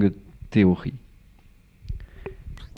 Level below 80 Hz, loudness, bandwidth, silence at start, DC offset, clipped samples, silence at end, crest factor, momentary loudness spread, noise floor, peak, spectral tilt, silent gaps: -42 dBFS; -23 LUFS; 6.2 kHz; 0 s; under 0.1%; under 0.1%; 0.1 s; 20 dB; 23 LU; -53 dBFS; -6 dBFS; -9 dB/octave; none